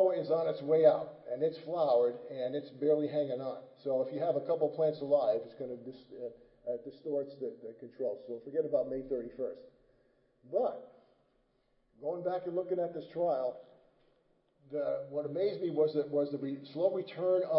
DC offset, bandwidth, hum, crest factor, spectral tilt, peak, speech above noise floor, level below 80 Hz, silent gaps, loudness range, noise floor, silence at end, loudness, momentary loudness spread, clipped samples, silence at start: under 0.1%; 5.6 kHz; none; 20 dB; -10 dB/octave; -14 dBFS; 40 dB; -76 dBFS; none; 8 LU; -74 dBFS; 0 s; -34 LUFS; 13 LU; under 0.1%; 0 s